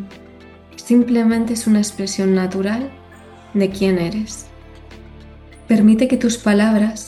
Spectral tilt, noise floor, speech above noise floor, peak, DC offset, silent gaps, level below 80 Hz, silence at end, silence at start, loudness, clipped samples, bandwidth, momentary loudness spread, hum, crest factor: -5.5 dB/octave; -42 dBFS; 26 dB; -4 dBFS; under 0.1%; none; -46 dBFS; 0 s; 0 s; -17 LUFS; under 0.1%; 12.5 kHz; 13 LU; none; 14 dB